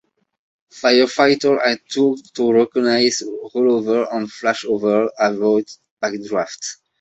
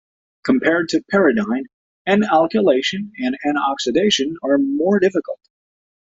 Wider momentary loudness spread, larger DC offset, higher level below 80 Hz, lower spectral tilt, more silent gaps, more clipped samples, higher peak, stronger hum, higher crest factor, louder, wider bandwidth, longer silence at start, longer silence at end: about the same, 10 LU vs 10 LU; neither; second, -64 dBFS vs -58 dBFS; about the same, -3.5 dB/octave vs -4.5 dB/octave; second, 5.91-5.97 s vs 1.73-2.05 s; neither; about the same, -2 dBFS vs -2 dBFS; neither; about the same, 18 dB vs 16 dB; about the same, -18 LUFS vs -18 LUFS; about the same, 8.2 kHz vs 7.8 kHz; first, 0.75 s vs 0.45 s; second, 0.25 s vs 0.75 s